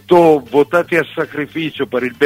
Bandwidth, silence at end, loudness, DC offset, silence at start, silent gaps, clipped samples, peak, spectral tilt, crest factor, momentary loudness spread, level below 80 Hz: 16 kHz; 0 s; -15 LUFS; under 0.1%; 0.1 s; none; under 0.1%; 0 dBFS; -6.5 dB/octave; 14 dB; 11 LU; -56 dBFS